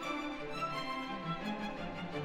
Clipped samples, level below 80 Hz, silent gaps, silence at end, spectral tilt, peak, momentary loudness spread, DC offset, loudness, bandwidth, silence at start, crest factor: under 0.1%; -56 dBFS; none; 0 s; -5.5 dB/octave; -26 dBFS; 3 LU; under 0.1%; -39 LUFS; 16 kHz; 0 s; 14 dB